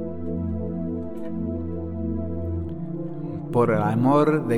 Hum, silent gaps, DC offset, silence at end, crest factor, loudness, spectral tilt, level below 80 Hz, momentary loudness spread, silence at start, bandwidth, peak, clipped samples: none; none; 0.9%; 0 s; 18 dB; -25 LUFS; -9 dB/octave; -44 dBFS; 12 LU; 0 s; 11.5 kHz; -8 dBFS; under 0.1%